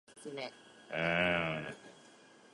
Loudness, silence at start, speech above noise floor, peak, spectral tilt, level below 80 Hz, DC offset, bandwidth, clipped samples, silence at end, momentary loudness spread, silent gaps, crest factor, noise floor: -35 LUFS; 0.1 s; 24 dB; -16 dBFS; -5 dB/octave; -64 dBFS; under 0.1%; 11.5 kHz; under 0.1%; 0.4 s; 18 LU; none; 22 dB; -60 dBFS